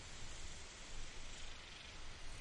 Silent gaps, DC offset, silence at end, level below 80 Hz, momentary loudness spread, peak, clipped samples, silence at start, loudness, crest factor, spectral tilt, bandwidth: none; under 0.1%; 0 s; -52 dBFS; 1 LU; -36 dBFS; under 0.1%; 0 s; -53 LUFS; 12 dB; -2 dB/octave; 11 kHz